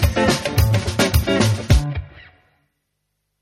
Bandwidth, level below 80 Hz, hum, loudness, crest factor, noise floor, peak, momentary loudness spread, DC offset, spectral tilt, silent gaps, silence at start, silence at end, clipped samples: 16 kHz; -26 dBFS; 50 Hz at -40 dBFS; -18 LUFS; 18 dB; -74 dBFS; -2 dBFS; 2 LU; under 0.1%; -5 dB/octave; none; 0 s; 1.2 s; under 0.1%